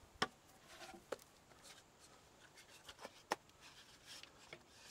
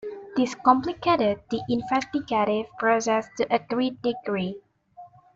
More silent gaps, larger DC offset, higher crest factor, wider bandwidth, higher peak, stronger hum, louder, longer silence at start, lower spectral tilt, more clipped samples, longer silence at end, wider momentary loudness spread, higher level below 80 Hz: neither; neither; first, 32 dB vs 22 dB; first, 16 kHz vs 7.8 kHz; second, -22 dBFS vs -4 dBFS; neither; second, -52 LUFS vs -25 LUFS; about the same, 0 s vs 0 s; second, -2 dB/octave vs -5 dB/octave; neither; second, 0 s vs 0.3 s; first, 19 LU vs 8 LU; second, -78 dBFS vs -60 dBFS